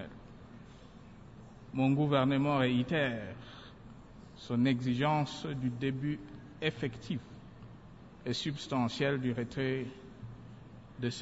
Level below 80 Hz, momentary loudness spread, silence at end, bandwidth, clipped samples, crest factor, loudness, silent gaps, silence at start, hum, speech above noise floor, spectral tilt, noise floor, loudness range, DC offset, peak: -62 dBFS; 24 LU; 0 s; 8 kHz; under 0.1%; 18 dB; -33 LUFS; none; 0 s; none; 21 dB; -6.5 dB/octave; -53 dBFS; 5 LU; under 0.1%; -16 dBFS